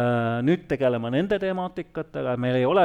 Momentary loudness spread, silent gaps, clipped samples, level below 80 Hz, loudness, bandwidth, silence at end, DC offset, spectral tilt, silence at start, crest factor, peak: 8 LU; none; under 0.1%; -54 dBFS; -25 LUFS; 9.6 kHz; 0 s; under 0.1%; -8.5 dB/octave; 0 s; 14 dB; -10 dBFS